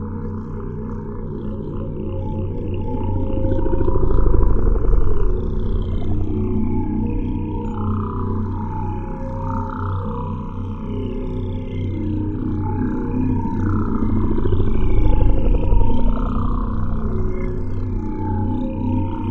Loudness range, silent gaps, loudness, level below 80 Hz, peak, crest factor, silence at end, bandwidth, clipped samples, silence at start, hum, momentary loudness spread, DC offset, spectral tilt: 5 LU; none; -23 LUFS; -22 dBFS; 0 dBFS; 16 dB; 0 s; 3.6 kHz; under 0.1%; 0 s; none; 8 LU; under 0.1%; -11 dB/octave